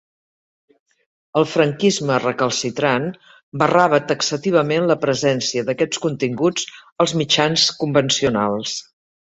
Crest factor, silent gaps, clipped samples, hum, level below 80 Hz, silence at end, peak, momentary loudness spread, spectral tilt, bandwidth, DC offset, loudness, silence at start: 18 dB; 3.43-3.52 s, 6.92-6.96 s; under 0.1%; none; -58 dBFS; 0.55 s; -2 dBFS; 7 LU; -4 dB/octave; 8.2 kHz; under 0.1%; -18 LUFS; 1.35 s